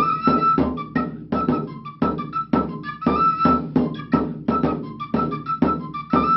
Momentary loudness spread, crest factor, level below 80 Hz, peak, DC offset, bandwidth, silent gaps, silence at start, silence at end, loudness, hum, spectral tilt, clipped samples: 8 LU; 18 dB; -42 dBFS; -4 dBFS; under 0.1%; 5.8 kHz; none; 0 s; 0 s; -22 LUFS; none; -10 dB/octave; under 0.1%